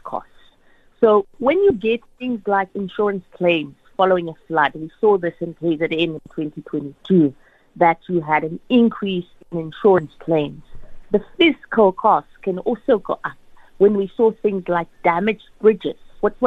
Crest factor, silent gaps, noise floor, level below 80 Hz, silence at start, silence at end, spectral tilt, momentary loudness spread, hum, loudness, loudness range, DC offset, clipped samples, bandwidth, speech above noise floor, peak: 16 dB; none; -53 dBFS; -50 dBFS; 0.05 s; 0 s; -8.5 dB/octave; 11 LU; none; -19 LUFS; 2 LU; under 0.1%; under 0.1%; 4.4 kHz; 34 dB; -2 dBFS